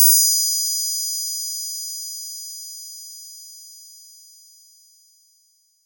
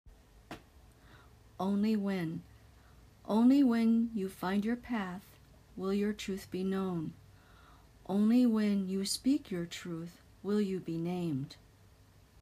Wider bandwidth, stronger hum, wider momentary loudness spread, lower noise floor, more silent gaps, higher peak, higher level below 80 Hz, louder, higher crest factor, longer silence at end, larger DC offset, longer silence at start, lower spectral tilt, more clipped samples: about the same, 16.5 kHz vs 15.5 kHz; neither; first, 25 LU vs 20 LU; about the same, -61 dBFS vs -61 dBFS; neither; first, -2 dBFS vs -18 dBFS; second, under -90 dBFS vs -64 dBFS; first, -19 LUFS vs -33 LUFS; first, 22 dB vs 16 dB; first, 1.75 s vs 0.9 s; neither; about the same, 0 s vs 0.05 s; second, 11.5 dB/octave vs -6 dB/octave; neither